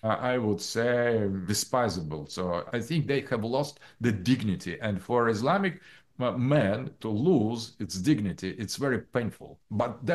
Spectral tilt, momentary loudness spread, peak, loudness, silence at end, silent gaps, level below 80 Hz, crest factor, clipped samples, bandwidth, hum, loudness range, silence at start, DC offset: -5.5 dB/octave; 9 LU; -12 dBFS; -29 LUFS; 0 s; none; -60 dBFS; 16 dB; under 0.1%; 12.5 kHz; none; 2 LU; 0.05 s; under 0.1%